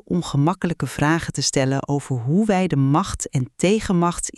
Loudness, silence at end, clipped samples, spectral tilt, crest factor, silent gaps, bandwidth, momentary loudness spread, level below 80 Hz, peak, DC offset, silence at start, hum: -21 LUFS; 0.1 s; under 0.1%; -5.5 dB/octave; 14 dB; none; 12.5 kHz; 6 LU; -42 dBFS; -6 dBFS; under 0.1%; 0.1 s; none